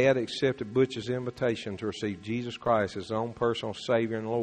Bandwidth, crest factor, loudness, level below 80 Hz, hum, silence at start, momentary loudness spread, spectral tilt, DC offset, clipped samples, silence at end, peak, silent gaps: 9.6 kHz; 18 dB; -30 LUFS; -60 dBFS; none; 0 s; 6 LU; -6 dB/octave; under 0.1%; under 0.1%; 0 s; -12 dBFS; none